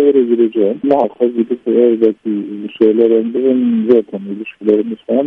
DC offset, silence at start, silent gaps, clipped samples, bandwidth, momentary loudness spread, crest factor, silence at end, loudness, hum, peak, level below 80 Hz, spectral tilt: under 0.1%; 0 s; none; under 0.1%; 3.8 kHz; 9 LU; 12 dB; 0 s; -14 LUFS; none; 0 dBFS; -62 dBFS; -9.5 dB/octave